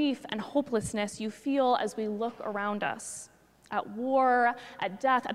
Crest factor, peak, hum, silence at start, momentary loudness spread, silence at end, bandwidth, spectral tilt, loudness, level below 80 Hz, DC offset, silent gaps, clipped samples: 18 dB; -12 dBFS; none; 0 s; 10 LU; 0 s; 14 kHz; -4 dB/octave; -30 LUFS; -66 dBFS; under 0.1%; none; under 0.1%